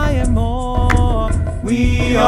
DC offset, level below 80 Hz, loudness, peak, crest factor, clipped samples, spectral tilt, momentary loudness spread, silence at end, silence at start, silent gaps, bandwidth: under 0.1%; -18 dBFS; -17 LUFS; 0 dBFS; 14 dB; under 0.1%; -6.5 dB/octave; 4 LU; 0 s; 0 s; none; 11.5 kHz